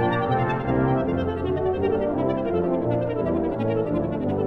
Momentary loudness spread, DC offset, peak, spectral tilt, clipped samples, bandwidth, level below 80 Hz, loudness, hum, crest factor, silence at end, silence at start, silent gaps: 3 LU; under 0.1%; -10 dBFS; -10 dB/octave; under 0.1%; 5.8 kHz; -42 dBFS; -24 LUFS; none; 12 dB; 0 s; 0 s; none